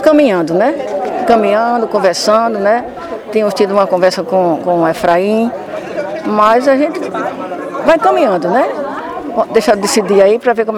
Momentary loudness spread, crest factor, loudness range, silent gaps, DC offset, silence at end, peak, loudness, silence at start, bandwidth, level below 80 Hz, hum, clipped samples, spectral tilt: 11 LU; 12 dB; 1 LU; none; under 0.1%; 0 s; 0 dBFS; -12 LUFS; 0 s; 16.5 kHz; -50 dBFS; none; 0.1%; -4.5 dB/octave